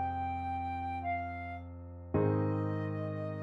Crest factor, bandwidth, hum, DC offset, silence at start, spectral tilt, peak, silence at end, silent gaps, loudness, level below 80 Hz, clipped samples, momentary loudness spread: 16 dB; 4.6 kHz; none; under 0.1%; 0 s; -10 dB/octave; -18 dBFS; 0 s; none; -36 LUFS; -54 dBFS; under 0.1%; 12 LU